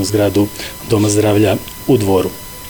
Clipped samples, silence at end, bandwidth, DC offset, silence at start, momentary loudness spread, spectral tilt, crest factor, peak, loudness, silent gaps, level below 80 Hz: under 0.1%; 0 s; over 20 kHz; 0.4%; 0 s; 7 LU; -5.5 dB/octave; 12 dB; -2 dBFS; -15 LUFS; none; -40 dBFS